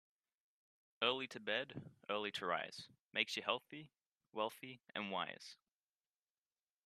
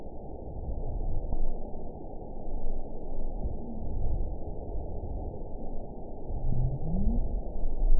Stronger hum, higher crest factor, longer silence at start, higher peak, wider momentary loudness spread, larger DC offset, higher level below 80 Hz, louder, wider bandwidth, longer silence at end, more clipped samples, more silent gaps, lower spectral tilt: neither; first, 28 dB vs 18 dB; first, 1 s vs 0 s; second, -18 dBFS vs -10 dBFS; first, 16 LU vs 10 LU; second, under 0.1% vs 0.5%; second, -88 dBFS vs -30 dBFS; second, -42 LUFS vs -38 LUFS; first, 13 kHz vs 1 kHz; first, 1.3 s vs 0 s; neither; first, 3.00-3.11 s, 4.06-4.16 s vs none; second, -3 dB/octave vs -16.5 dB/octave